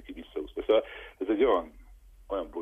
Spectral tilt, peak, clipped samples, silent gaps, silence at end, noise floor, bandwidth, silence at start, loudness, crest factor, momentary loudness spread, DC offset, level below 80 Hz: -6.5 dB/octave; -12 dBFS; under 0.1%; none; 0 s; -53 dBFS; 3.8 kHz; 0.1 s; -29 LUFS; 18 dB; 15 LU; under 0.1%; -52 dBFS